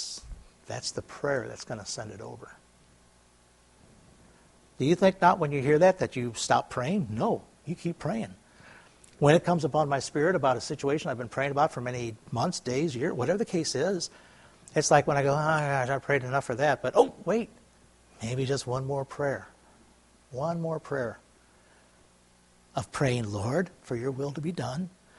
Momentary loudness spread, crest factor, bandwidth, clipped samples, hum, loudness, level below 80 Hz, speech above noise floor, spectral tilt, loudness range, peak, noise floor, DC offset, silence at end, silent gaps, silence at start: 14 LU; 24 dB; 11.5 kHz; under 0.1%; 60 Hz at -60 dBFS; -28 LUFS; -60 dBFS; 33 dB; -5.5 dB/octave; 11 LU; -6 dBFS; -61 dBFS; under 0.1%; 0.3 s; none; 0 s